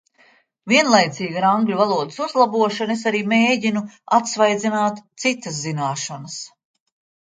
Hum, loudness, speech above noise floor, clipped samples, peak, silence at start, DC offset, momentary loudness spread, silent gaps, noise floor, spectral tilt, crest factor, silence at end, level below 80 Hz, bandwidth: none; -19 LUFS; 37 dB; under 0.1%; -2 dBFS; 0.65 s; under 0.1%; 11 LU; none; -56 dBFS; -4 dB/octave; 18 dB; 0.75 s; -70 dBFS; 9.4 kHz